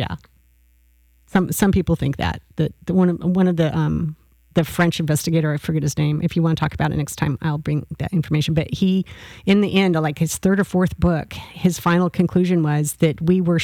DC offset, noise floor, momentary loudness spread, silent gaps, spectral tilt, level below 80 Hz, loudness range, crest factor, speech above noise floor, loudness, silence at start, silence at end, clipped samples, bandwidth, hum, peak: under 0.1%; -56 dBFS; 7 LU; none; -6.5 dB/octave; -42 dBFS; 2 LU; 14 dB; 37 dB; -20 LUFS; 0 s; 0 s; under 0.1%; 18 kHz; none; -6 dBFS